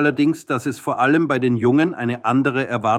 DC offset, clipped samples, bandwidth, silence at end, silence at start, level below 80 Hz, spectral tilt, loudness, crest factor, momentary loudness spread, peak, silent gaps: under 0.1%; under 0.1%; 14.5 kHz; 0 s; 0 s; -62 dBFS; -6.5 dB/octave; -19 LUFS; 14 dB; 6 LU; -4 dBFS; none